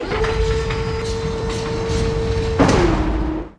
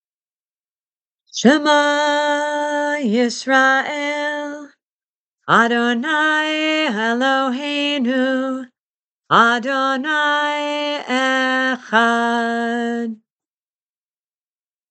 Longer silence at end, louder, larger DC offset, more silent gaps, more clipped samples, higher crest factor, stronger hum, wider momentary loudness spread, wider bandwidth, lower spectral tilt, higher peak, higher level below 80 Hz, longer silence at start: second, 0.05 s vs 1.75 s; second, -20 LUFS vs -17 LUFS; neither; second, none vs 4.89-5.36 s, 8.80-9.19 s; neither; about the same, 18 dB vs 20 dB; neither; about the same, 8 LU vs 9 LU; first, 10.5 kHz vs 9 kHz; first, -6 dB/octave vs -3.5 dB/octave; about the same, 0 dBFS vs 0 dBFS; first, -26 dBFS vs -74 dBFS; second, 0 s vs 1.35 s